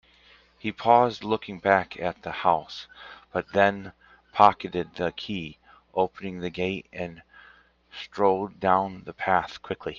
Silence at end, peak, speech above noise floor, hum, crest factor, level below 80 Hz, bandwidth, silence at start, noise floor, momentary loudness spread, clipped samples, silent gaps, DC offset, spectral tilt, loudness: 0 s; -2 dBFS; 32 dB; none; 24 dB; -62 dBFS; 7.2 kHz; 0.65 s; -57 dBFS; 18 LU; under 0.1%; none; under 0.1%; -6.5 dB/octave; -26 LUFS